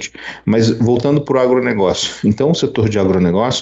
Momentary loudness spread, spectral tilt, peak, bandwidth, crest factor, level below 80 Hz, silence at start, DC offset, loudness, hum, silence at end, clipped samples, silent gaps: 3 LU; -6 dB/octave; -4 dBFS; 8.2 kHz; 12 dB; -46 dBFS; 0 s; under 0.1%; -15 LUFS; none; 0 s; under 0.1%; none